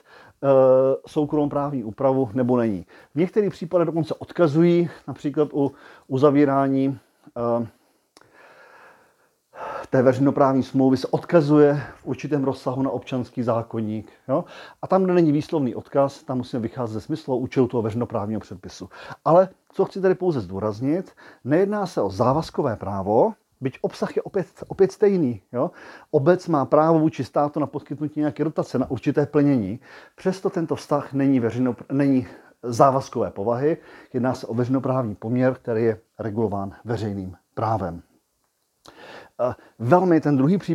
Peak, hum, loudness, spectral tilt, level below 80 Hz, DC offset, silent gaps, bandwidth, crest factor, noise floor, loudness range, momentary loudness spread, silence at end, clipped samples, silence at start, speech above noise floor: 0 dBFS; none; -22 LUFS; -8.5 dB/octave; -60 dBFS; under 0.1%; none; 12 kHz; 22 dB; -71 dBFS; 5 LU; 13 LU; 0 s; under 0.1%; 0.4 s; 49 dB